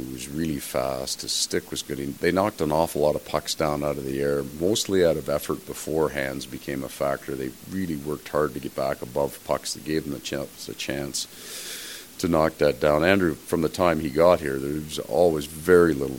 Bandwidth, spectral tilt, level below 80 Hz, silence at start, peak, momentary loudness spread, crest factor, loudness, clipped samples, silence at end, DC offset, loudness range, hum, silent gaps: 17 kHz; -4.5 dB/octave; -48 dBFS; 0 s; -4 dBFS; 12 LU; 22 dB; -25 LUFS; under 0.1%; 0 s; 0.1%; 7 LU; none; none